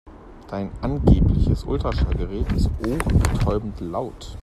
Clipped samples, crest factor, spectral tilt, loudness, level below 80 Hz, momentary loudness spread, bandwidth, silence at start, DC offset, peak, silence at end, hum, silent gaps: under 0.1%; 18 dB; -7.5 dB/octave; -23 LUFS; -26 dBFS; 12 LU; 13.5 kHz; 0.05 s; under 0.1%; -2 dBFS; 0 s; none; none